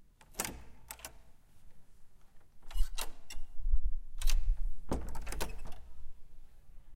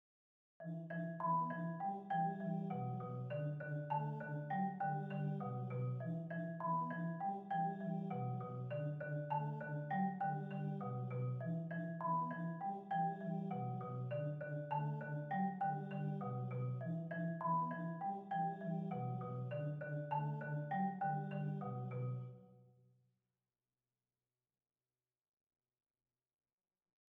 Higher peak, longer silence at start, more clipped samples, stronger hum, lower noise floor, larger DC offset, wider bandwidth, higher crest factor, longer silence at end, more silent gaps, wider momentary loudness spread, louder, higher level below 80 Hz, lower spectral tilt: first, -16 dBFS vs -28 dBFS; second, 0.35 s vs 0.6 s; neither; neither; second, -53 dBFS vs under -90 dBFS; neither; first, 16.5 kHz vs 3.8 kHz; about the same, 16 dB vs 14 dB; second, 0 s vs 4.5 s; neither; first, 20 LU vs 5 LU; about the same, -42 LUFS vs -43 LUFS; first, -36 dBFS vs -86 dBFS; second, -3.5 dB/octave vs -10.5 dB/octave